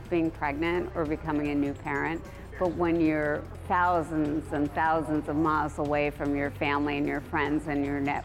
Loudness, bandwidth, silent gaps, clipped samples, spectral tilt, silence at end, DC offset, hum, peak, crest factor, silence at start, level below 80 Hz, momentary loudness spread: -28 LUFS; 13.5 kHz; none; under 0.1%; -7 dB/octave; 0 s; under 0.1%; none; -14 dBFS; 14 dB; 0 s; -46 dBFS; 5 LU